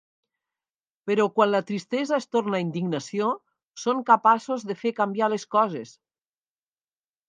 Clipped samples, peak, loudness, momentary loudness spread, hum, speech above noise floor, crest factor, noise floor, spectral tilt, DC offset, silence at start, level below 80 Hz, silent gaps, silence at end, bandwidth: under 0.1%; -4 dBFS; -24 LUFS; 10 LU; none; over 66 dB; 22 dB; under -90 dBFS; -5.5 dB/octave; under 0.1%; 1.05 s; -80 dBFS; 3.69-3.74 s; 1.4 s; 9.6 kHz